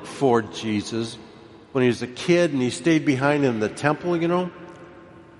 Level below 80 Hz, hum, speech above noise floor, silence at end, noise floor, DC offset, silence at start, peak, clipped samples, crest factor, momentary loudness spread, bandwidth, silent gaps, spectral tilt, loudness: -62 dBFS; none; 24 dB; 0.2 s; -46 dBFS; under 0.1%; 0 s; -4 dBFS; under 0.1%; 20 dB; 12 LU; 11.5 kHz; none; -6 dB/octave; -23 LUFS